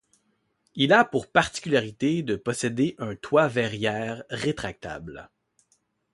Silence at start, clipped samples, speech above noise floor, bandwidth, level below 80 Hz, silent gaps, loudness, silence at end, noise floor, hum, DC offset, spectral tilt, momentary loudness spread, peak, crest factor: 0.75 s; under 0.1%; 47 dB; 11.5 kHz; -56 dBFS; none; -25 LUFS; 0.9 s; -72 dBFS; none; under 0.1%; -5 dB/octave; 17 LU; -4 dBFS; 22 dB